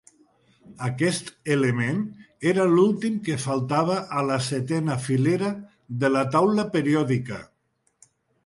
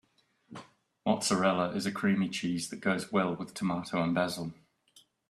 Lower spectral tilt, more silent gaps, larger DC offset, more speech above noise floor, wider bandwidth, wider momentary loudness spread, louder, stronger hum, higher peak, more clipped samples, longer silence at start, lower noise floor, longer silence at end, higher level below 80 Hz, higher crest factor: about the same, -6 dB/octave vs -5 dB/octave; neither; neither; first, 48 dB vs 35 dB; second, 11.5 kHz vs 13.5 kHz; second, 10 LU vs 15 LU; first, -24 LUFS vs -31 LUFS; neither; first, -6 dBFS vs -14 dBFS; neither; first, 0.7 s vs 0.5 s; first, -71 dBFS vs -66 dBFS; first, 1 s vs 0.75 s; first, -62 dBFS vs -70 dBFS; about the same, 18 dB vs 18 dB